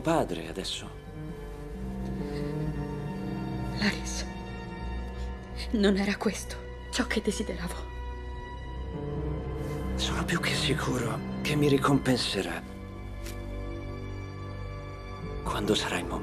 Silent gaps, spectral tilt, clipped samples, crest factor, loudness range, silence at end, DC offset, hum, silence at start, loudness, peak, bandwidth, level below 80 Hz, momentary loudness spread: none; -5 dB/octave; under 0.1%; 22 dB; 7 LU; 0 s; under 0.1%; none; 0 s; -32 LUFS; -10 dBFS; 14 kHz; -40 dBFS; 14 LU